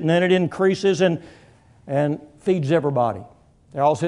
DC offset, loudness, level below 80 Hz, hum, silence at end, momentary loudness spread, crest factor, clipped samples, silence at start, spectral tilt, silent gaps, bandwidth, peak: under 0.1%; -21 LUFS; -60 dBFS; none; 0 s; 9 LU; 16 dB; under 0.1%; 0 s; -6.5 dB/octave; none; 10.5 kHz; -6 dBFS